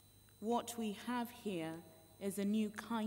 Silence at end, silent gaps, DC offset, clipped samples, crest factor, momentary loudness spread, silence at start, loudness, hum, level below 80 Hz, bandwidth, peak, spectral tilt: 0 s; none; under 0.1%; under 0.1%; 16 dB; 10 LU; 0.05 s; -41 LUFS; none; -76 dBFS; 16 kHz; -26 dBFS; -5 dB/octave